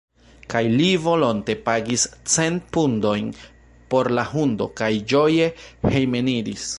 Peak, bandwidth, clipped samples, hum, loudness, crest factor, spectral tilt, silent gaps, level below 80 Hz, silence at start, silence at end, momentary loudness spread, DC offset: -4 dBFS; 11.5 kHz; under 0.1%; none; -21 LUFS; 16 dB; -4.5 dB/octave; none; -48 dBFS; 0.5 s; 0 s; 6 LU; under 0.1%